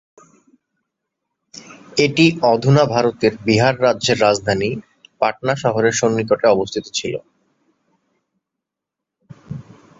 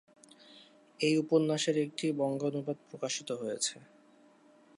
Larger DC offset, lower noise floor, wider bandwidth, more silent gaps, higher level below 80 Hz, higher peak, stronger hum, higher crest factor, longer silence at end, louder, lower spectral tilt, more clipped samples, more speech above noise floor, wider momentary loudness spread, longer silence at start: neither; first, -83 dBFS vs -62 dBFS; second, 8 kHz vs 11.5 kHz; neither; first, -54 dBFS vs -86 dBFS; first, -2 dBFS vs -16 dBFS; neither; about the same, 18 dB vs 20 dB; second, 0.4 s vs 1 s; first, -17 LUFS vs -32 LUFS; about the same, -5 dB/octave vs -4.5 dB/octave; neither; first, 67 dB vs 30 dB; first, 17 LU vs 10 LU; first, 1.55 s vs 0.55 s